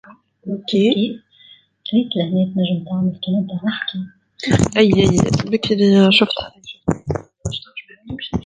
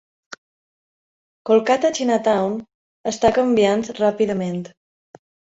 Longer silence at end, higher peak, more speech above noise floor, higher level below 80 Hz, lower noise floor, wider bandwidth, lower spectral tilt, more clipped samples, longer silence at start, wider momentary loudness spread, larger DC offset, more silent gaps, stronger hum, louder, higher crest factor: second, 0 s vs 0.9 s; about the same, -2 dBFS vs -2 dBFS; second, 32 dB vs over 72 dB; first, -42 dBFS vs -56 dBFS; second, -49 dBFS vs under -90 dBFS; first, 9.6 kHz vs 8 kHz; about the same, -5.5 dB/octave vs -5 dB/octave; neither; second, 0.1 s vs 1.45 s; first, 18 LU vs 14 LU; neither; second, none vs 2.74-3.04 s; neither; about the same, -18 LUFS vs -19 LUFS; about the same, 16 dB vs 18 dB